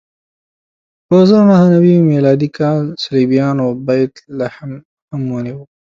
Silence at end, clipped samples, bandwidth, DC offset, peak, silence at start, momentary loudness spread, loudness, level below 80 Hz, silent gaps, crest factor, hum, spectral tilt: 0.2 s; under 0.1%; 7.4 kHz; under 0.1%; 0 dBFS; 1.1 s; 15 LU; -13 LUFS; -54 dBFS; 4.85-5.08 s; 12 dB; none; -8.5 dB/octave